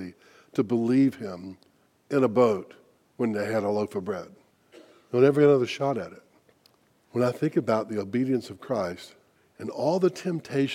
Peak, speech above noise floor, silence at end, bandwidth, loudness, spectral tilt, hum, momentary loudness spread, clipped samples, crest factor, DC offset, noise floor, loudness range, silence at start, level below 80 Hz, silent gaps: -8 dBFS; 38 dB; 0 s; 14 kHz; -26 LUFS; -7 dB/octave; none; 16 LU; under 0.1%; 18 dB; under 0.1%; -63 dBFS; 4 LU; 0 s; -74 dBFS; none